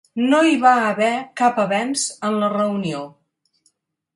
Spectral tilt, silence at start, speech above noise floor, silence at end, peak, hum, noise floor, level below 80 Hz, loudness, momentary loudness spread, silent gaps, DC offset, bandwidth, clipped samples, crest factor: -4 dB/octave; 0.15 s; 47 dB; 1.05 s; -2 dBFS; none; -66 dBFS; -70 dBFS; -18 LUFS; 10 LU; none; under 0.1%; 11.5 kHz; under 0.1%; 18 dB